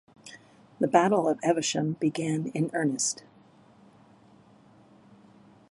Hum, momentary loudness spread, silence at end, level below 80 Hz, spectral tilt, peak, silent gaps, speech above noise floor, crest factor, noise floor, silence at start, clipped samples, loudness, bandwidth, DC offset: none; 17 LU; 2.55 s; -76 dBFS; -4.5 dB/octave; -6 dBFS; none; 31 dB; 24 dB; -57 dBFS; 0.25 s; under 0.1%; -27 LUFS; 11.5 kHz; under 0.1%